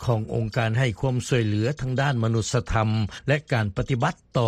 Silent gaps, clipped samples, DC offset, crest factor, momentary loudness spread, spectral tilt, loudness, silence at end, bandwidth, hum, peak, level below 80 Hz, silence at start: none; under 0.1%; under 0.1%; 16 dB; 3 LU; -6 dB/octave; -25 LUFS; 0 s; 10.5 kHz; none; -8 dBFS; -42 dBFS; 0 s